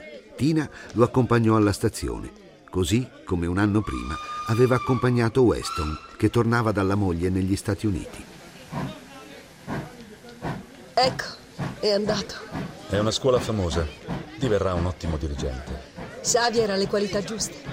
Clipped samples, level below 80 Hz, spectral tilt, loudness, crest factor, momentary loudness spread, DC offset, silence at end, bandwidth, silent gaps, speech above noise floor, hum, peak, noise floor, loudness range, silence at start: under 0.1%; -42 dBFS; -5.5 dB/octave; -25 LUFS; 20 dB; 16 LU; under 0.1%; 0 s; 16 kHz; none; 21 dB; none; -6 dBFS; -44 dBFS; 7 LU; 0 s